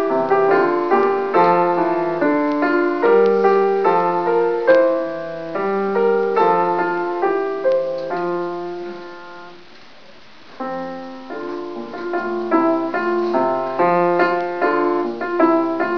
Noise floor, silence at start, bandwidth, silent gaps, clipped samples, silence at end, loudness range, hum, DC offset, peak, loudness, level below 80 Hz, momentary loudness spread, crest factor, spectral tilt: -45 dBFS; 0 s; 5.4 kHz; none; under 0.1%; 0 s; 12 LU; none; 0.8%; -2 dBFS; -18 LUFS; -68 dBFS; 14 LU; 16 dB; -8 dB/octave